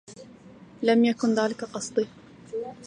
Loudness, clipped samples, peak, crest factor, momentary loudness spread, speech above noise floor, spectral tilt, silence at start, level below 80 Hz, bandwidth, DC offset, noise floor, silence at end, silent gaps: -26 LUFS; under 0.1%; -8 dBFS; 18 dB; 16 LU; 25 dB; -4.5 dB/octave; 0.1 s; -68 dBFS; 10 kHz; under 0.1%; -49 dBFS; 0 s; none